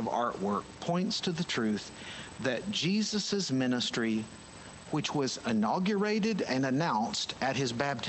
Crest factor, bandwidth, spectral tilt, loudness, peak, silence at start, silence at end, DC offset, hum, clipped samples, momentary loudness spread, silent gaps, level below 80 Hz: 16 dB; 8.6 kHz; -4.5 dB/octave; -31 LUFS; -14 dBFS; 0 s; 0 s; under 0.1%; none; under 0.1%; 7 LU; none; -64 dBFS